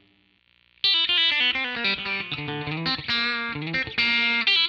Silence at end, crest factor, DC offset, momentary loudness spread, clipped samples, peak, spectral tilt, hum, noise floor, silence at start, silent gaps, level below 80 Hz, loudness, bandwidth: 0 s; 14 dB; under 0.1%; 9 LU; under 0.1%; -10 dBFS; -4 dB/octave; 60 Hz at -65 dBFS; -63 dBFS; 0.85 s; none; -58 dBFS; -22 LUFS; 13.5 kHz